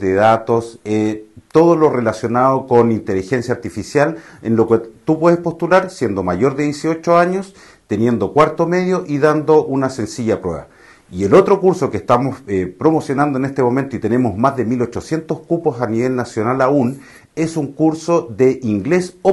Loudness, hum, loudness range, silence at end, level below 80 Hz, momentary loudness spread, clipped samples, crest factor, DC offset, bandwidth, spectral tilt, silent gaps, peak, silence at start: -16 LUFS; none; 2 LU; 0 s; -50 dBFS; 9 LU; under 0.1%; 16 dB; under 0.1%; 12 kHz; -7 dB/octave; none; 0 dBFS; 0 s